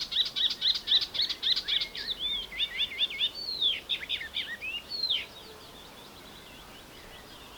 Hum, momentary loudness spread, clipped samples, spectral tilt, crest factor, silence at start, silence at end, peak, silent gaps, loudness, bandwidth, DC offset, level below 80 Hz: none; 22 LU; under 0.1%; -0.5 dB/octave; 20 dB; 0 s; 0 s; -14 dBFS; none; -28 LUFS; over 20 kHz; under 0.1%; -60 dBFS